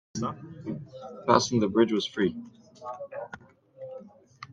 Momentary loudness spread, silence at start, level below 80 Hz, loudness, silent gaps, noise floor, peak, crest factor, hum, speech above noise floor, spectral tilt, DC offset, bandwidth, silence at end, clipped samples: 22 LU; 0.15 s; -68 dBFS; -28 LUFS; none; -49 dBFS; -4 dBFS; 26 dB; none; 21 dB; -5 dB/octave; under 0.1%; 8.6 kHz; 0 s; under 0.1%